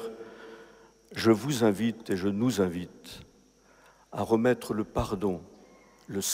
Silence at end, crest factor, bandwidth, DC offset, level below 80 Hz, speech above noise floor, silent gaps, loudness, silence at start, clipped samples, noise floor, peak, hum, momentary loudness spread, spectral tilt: 0 s; 20 dB; 16 kHz; under 0.1%; -54 dBFS; 32 dB; none; -28 LUFS; 0 s; under 0.1%; -60 dBFS; -10 dBFS; none; 21 LU; -5 dB/octave